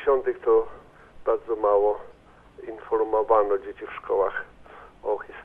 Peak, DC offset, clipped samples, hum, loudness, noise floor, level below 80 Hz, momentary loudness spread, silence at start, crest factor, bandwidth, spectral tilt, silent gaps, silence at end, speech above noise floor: -8 dBFS; under 0.1%; under 0.1%; none; -25 LUFS; -49 dBFS; -54 dBFS; 16 LU; 0 s; 18 dB; 3.7 kHz; -7.5 dB/octave; none; 0 s; 25 dB